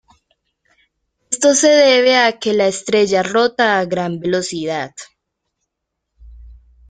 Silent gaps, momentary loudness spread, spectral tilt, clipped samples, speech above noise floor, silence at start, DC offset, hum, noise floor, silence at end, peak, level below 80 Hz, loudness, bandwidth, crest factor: none; 13 LU; -3 dB/octave; under 0.1%; 63 dB; 1.3 s; under 0.1%; none; -77 dBFS; 0.35 s; -2 dBFS; -50 dBFS; -15 LUFS; 9.8 kHz; 16 dB